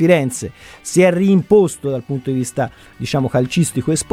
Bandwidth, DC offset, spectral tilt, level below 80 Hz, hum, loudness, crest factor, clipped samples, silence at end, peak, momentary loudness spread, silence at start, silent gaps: 15.5 kHz; under 0.1%; -6 dB/octave; -48 dBFS; none; -17 LUFS; 16 dB; under 0.1%; 0.1 s; 0 dBFS; 13 LU; 0 s; none